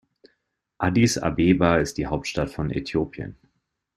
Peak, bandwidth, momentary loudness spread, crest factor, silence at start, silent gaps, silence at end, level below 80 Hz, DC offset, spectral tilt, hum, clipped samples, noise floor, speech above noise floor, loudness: -4 dBFS; 14 kHz; 10 LU; 20 dB; 0.8 s; none; 0.65 s; -44 dBFS; under 0.1%; -5.5 dB/octave; none; under 0.1%; -74 dBFS; 52 dB; -23 LUFS